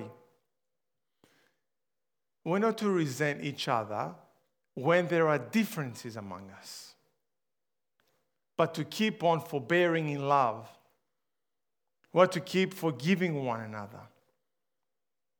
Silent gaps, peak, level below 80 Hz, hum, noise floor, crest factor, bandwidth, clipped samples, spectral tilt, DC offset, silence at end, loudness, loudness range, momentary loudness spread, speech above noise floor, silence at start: none; -8 dBFS; -86 dBFS; none; under -90 dBFS; 26 dB; over 20 kHz; under 0.1%; -6 dB/octave; under 0.1%; 1.3 s; -30 LUFS; 5 LU; 18 LU; over 60 dB; 0 s